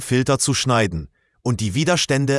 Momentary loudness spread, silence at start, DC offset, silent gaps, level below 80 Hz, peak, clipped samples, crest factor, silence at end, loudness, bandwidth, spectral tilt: 8 LU; 0 s; under 0.1%; none; -46 dBFS; -4 dBFS; under 0.1%; 16 dB; 0 s; -19 LUFS; 12 kHz; -4.5 dB/octave